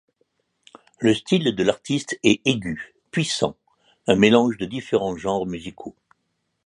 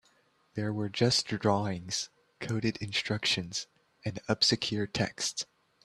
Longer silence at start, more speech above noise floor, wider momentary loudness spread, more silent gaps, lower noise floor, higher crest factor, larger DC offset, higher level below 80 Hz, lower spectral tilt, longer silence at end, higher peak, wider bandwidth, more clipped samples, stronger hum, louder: first, 1 s vs 0.55 s; first, 53 dB vs 37 dB; about the same, 15 LU vs 14 LU; neither; first, -74 dBFS vs -68 dBFS; about the same, 22 dB vs 22 dB; neither; first, -54 dBFS vs -64 dBFS; about the same, -5 dB/octave vs -4 dB/octave; first, 0.75 s vs 0.4 s; first, -2 dBFS vs -10 dBFS; second, 11.5 kHz vs 13 kHz; neither; neither; first, -22 LUFS vs -31 LUFS